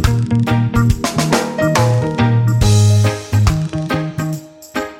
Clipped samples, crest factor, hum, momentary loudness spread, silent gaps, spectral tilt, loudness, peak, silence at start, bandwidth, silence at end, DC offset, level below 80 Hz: under 0.1%; 14 dB; none; 10 LU; none; -6 dB/octave; -15 LUFS; 0 dBFS; 0 s; 16 kHz; 0 s; under 0.1%; -28 dBFS